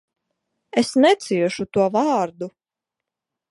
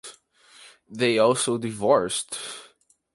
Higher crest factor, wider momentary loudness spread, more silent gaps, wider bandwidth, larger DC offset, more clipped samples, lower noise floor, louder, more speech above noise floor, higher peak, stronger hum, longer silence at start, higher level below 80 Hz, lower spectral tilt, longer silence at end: about the same, 18 dB vs 20 dB; second, 11 LU vs 21 LU; neither; about the same, 11.5 kHz vs 11.5 kHz; neither; neither; first, -86 dBFS vs -59 dBFS; first, -20 LUFS vs -23 LUFS; first, 66 dB vs 36 dB; about the same, -4 dBFS vs -6 dBFS; neither; first, 0.75 s vs 0.05 s; about the same, -64 dBFS vs -66 dBFS; first, -5 dB/octave vs -3.5 dB/octave; first, 1 s vs 0.5 s